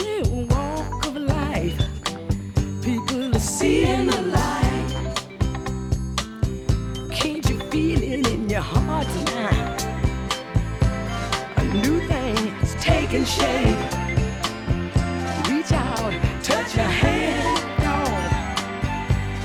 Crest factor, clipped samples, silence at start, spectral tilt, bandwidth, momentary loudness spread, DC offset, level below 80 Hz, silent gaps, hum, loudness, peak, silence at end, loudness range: 18 dB; under 0.1%; 0 s; -5 dB/octave; 17.5 kHz; 6 LU; under 0.1%; -30 dBFS; none; none; -23 LUFS; -4 dBFS; 0 s; 3 LU